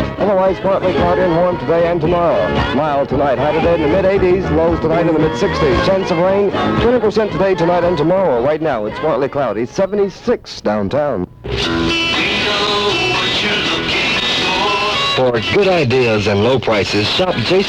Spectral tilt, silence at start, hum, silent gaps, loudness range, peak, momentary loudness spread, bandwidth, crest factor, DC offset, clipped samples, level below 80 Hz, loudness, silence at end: -5.5 dB/octave; 0 s; none; none; 3 LU; -4 dBFS; 4 LU; 12 kHz; 10 dB; under 0.1%; under 0.1%; -34 dBFS; -14 LUFS; 0 s